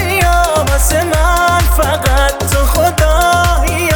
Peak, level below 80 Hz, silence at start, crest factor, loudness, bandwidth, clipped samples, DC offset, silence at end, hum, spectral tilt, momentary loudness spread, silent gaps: 0 dBFS; -16 dBFS; 0 s; 10 dB; -12 LUFS; over 20 kHz; under 0.1%; under 0.1%; 0 s; none; -4 dB/octave; 2 LU; none